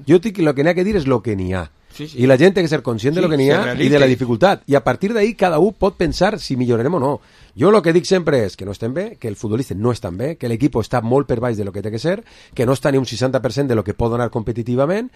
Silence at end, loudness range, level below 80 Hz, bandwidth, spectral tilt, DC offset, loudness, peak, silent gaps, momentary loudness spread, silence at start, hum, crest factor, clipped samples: 0.1 s; 5 LU; -40 dBFS; 14.5 kHz; -6.5 dB/octave; under 0.1%; -17 LUFS; 0 dBFS; none; 10 LU; 0 s; none; 16 dB; under 0.1%